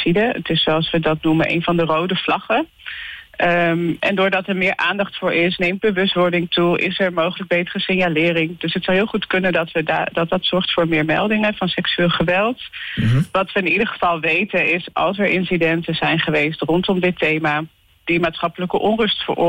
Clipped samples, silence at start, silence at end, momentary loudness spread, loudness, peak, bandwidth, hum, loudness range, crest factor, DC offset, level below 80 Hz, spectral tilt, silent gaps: under 0.1%; 0 s; 0 s; 4 LU; -18 LUFS; -10 dBFS; 16 kHz; none; 1 LU; 10 dB; under 0.1%; -48 dBFS; -7 dB/octave; none